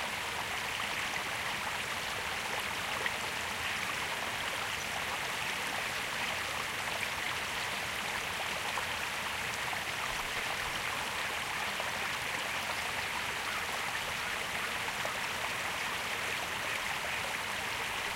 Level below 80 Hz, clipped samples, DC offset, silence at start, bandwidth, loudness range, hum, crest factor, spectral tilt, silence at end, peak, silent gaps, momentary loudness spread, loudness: -60 dBFS; under 0.1%; under 0.1%; 0 s; 16 kHz; 0 LU; none; 18 dB; -1 dB/octave; 0 s; -18 dBFS; none; 1 LU; -34 LUFS